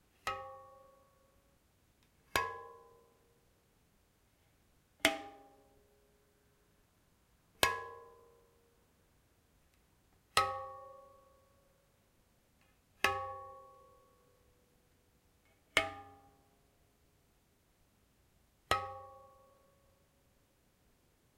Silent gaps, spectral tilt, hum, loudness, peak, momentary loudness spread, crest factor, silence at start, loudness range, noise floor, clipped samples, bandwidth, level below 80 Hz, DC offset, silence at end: none; -2 dB/octave; none; -36 LUFS; -6 dBFS; 23 LU; 40 dB; 0.25 s; 5 LU; -72 dBFS; under 0.1%; 16 kHz; -70 dBFS; under 0.1%; 2.1 s